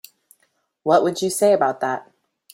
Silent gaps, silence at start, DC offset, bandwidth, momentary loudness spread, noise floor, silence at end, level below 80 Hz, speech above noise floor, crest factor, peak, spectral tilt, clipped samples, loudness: none; 0.85 s; under 0.1%; 16.5 kHz; 11 LU; -67 dBFS; 0.5 s; -68 dBFS; 49 dB; 18 dB; -4 dBFS; -4 dB/octave; under 0.1%; -20 LUFS